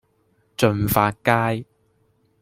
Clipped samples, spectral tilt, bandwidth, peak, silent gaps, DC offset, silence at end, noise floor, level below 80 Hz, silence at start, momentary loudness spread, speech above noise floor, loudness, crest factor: under 0.1%; -5.5 dB/octave; 16.5 kHz; -2 dBFS; none; under 0.1%; 0.8 s; -64 dBFS; -48 dBFS; 0.6 s; 10 LU; 45 dB; -21 LUFS; 20 dB